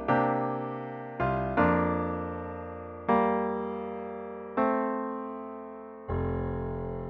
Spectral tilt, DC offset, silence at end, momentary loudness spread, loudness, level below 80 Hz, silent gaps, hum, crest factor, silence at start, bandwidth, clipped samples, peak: -10 dB/octave; under 0.1%; 0 s; 14 LU; -31 LUFS; -48 dBFS; none; none; 20 dB; 0 s; 5.6 kHz; under 0.1%; -10 dBFS